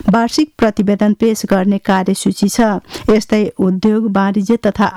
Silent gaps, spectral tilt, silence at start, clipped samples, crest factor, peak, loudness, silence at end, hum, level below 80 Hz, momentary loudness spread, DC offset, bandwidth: none; -6 dB/octave; 0.05 s; under 0.1%; 8 dB; -4 dBFS; -14 LUFS; 0 s; none; -42 dBFS; 3 LU; under 0.1%; 14 kHz